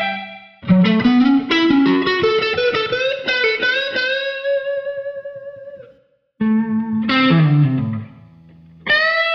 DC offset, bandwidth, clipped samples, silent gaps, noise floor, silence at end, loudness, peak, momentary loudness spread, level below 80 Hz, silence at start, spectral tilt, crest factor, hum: under 0.1%; 6.8 kHz; under 0.1%; none; -54 dBFS; 0 s; -16 LUFS; -2 dBFS; 16 LU; -54 dBFS; 0 s; -7 dB/octave; 14 dB; none